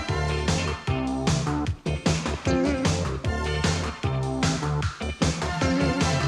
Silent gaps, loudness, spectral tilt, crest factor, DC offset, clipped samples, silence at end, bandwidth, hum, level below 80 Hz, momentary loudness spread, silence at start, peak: none; -26 LUFS; -5 dB/octave; 16 dB; under 0.1%; under 0.1%; 0 s; 12.5 kHz; none; -36 dBFS; 5 LU; 0 s; -10 dBFS